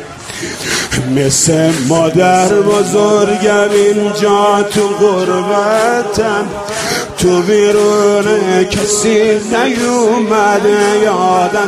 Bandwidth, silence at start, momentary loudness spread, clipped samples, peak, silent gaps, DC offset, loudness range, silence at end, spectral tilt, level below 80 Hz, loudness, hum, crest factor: 15 kHz; 0 s; 6 LU; under 0.1%; 0 dBFS; none; under 0.1%; 2 LU; 0 s; -4 dB/octave; -40 dBFS; -11 LUFS; none; 10 dB